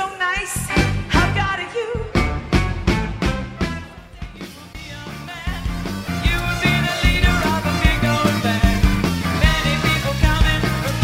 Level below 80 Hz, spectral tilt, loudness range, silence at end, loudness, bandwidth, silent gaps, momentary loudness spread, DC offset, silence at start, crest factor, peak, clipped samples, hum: -24 dBFS; -5 dB/octave; 8 LU; 0 s; -19 LUFS; 16 kHz; none; 15 LU; under 0.1%; 0 s; 18 dB; -2 dBFS; under 0.1%; none